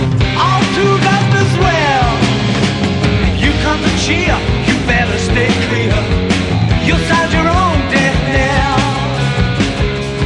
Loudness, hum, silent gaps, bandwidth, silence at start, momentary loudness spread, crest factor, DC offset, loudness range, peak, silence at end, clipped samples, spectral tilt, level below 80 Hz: -13 LUFS; none; none; 11 kHz; 0 s; 3 LU; 12 dB; under 0.1%; 1 LU; 0 dBFS; 0 s; under 0.1%; -5.5 dB/octave; -22 dBFS